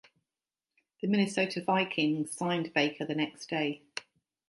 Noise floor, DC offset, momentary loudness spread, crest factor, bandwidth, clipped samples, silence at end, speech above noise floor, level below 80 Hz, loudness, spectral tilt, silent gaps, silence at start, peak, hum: under -90 dBFS; under 0.1%; 9 LU; 22 dB; 11.5 kHz; under 0.1%; 0.5 s; over 60 dB; -80 dBFS; -31 LUFS; -5 dB/octave; none; 1.05 s; -12 dBFS; none